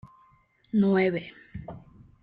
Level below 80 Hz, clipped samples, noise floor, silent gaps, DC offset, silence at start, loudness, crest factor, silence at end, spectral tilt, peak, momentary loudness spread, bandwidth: -58 dBFS; under 0.1%; -62 dBFS; none; under 0.1%; 0.75 s; -25 LUFS; 16 dB; 0.45 s; -10 dB/octave; -12 dBFS; 21 LU; 4.7 kHz